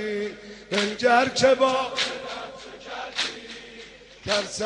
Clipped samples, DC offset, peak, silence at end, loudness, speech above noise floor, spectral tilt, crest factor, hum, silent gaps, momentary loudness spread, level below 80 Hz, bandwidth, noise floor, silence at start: under 0.1%; under 0.1%; -8 dBFS; 0 s; -24 LUFS; 23 dB; -2.5 dB/octave; 18 dB; none; none; 21 LU; -58 dBFS; 10.5 kHz; -45 dBFS; 0 s